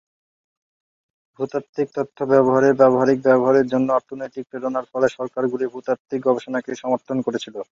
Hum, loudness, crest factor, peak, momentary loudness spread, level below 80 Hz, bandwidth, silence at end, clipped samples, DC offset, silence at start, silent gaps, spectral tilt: none; -20 LUFS; 18 dB; -2 dBFS; 12 LU; -66 dBFS; 7.6 kHz; 0.1 s; under 0.1%; under 0.1%; 1.4 s; 1.69-1.73 s, 6.00-6.05 s; -7 dB/octave